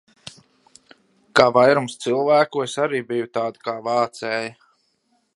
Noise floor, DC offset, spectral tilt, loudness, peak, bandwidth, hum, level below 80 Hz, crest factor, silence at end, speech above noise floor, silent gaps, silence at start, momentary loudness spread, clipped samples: -67 dBFS; under 0.1%; -4.5 dB/octave; -20 LUFS; 0 dBFS; 11.5 kHz; none; -64 dBFS; 22 dB; 0.85 s; 47 dB; none; 1.35 s; 14 LU; under 0.1%